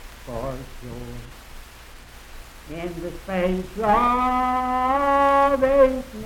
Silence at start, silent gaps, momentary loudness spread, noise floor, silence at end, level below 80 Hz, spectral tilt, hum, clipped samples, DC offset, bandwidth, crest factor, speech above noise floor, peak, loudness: 0 s; none; 20 LU; -43 dBFS; 0 s; -40 dBFS; -6 dB/octave; none; under 0.1%; under 0.1%; 17 kHz; 16 dB; 21 dB; -6 dBFS; -21 LUFS